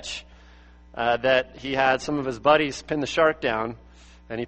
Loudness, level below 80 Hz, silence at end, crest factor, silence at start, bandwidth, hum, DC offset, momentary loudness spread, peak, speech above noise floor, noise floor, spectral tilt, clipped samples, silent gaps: -23 LUFS; -50 dBFS; 0 s; 20 dB; 0 s; 8.4 kHz; none; under 0.1%; 15 LU; -4 dBFS; 26 dB; -50 dBFS; -4.5 dB/octave; under 0.1%; none